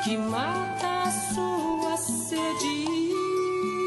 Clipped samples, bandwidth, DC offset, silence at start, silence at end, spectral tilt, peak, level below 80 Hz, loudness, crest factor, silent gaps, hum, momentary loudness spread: under 0.1%; 12 kHz; under 0.1%; 0 s; 0 s; -3.5 dB/octave; -14 dBFS; -60 dBFS; -27 LUFS; 14 dB; none; none; 1 LU